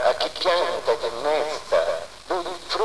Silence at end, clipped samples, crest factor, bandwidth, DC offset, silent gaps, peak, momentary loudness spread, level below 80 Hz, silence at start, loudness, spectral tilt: 0 s; under 0.1%; 16 dB; 11 kHz; 1%; none; -8 dBFS; 7 LU; -54 dBFS; 0 s; -24 LUFS; -2 dB/octave